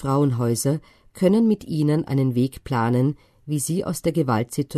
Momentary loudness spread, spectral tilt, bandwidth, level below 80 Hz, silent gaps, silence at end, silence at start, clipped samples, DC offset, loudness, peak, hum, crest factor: 6 LU; -6.5 dB/octave; 13.5 kHz; -52 dBFS; none; 0 s; 0 s; under 0.1%; under 0.1%; -22 LUFS; -6 dBFS; none; 16 dB